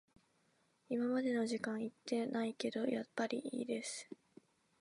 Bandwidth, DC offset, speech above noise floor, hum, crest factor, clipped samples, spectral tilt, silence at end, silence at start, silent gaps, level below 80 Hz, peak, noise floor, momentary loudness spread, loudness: 11.5 kHz; under 0.1%; 37 dB; none; 18 dB; under 0.1%; -4.5 dB/octave; 0.65 s; 0.9 s; none; -88 dBFS; -24 dBFS; -76 dBFS; 8 LU; -40 LUFS